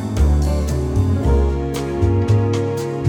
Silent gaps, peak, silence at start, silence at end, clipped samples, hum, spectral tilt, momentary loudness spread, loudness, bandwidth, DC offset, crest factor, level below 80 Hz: none; -4 dBFS; 0 s; 0 s; under 0.1%; none; -7.5 dB/octave; 5 LU; -18 LUFS; 14.5 kHz; under 0.1%; 12 dB; -22 dBFS